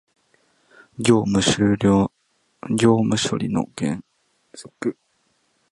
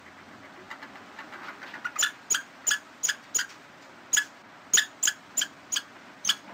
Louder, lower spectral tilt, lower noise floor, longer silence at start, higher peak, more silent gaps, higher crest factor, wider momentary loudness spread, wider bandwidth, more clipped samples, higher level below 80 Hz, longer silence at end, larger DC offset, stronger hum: first, -20 LUFS vs -27 LUFS; first, -5.5 dB/octave vs 2.5 dB/octave; first, -67 dBFS vs -50 dBFS; first, 1 s vs 0 s; first, -2 dBFS vs -8 dBFS; neither; about the same, 20 dB vs 24 dB; second, 18 LU vs 24 LU; second, 11.5 kHz vs 16 kHz; neither; first, -50 dBFS vs -74 dBFS; first, 0.8 s vs 0 s; neither; neither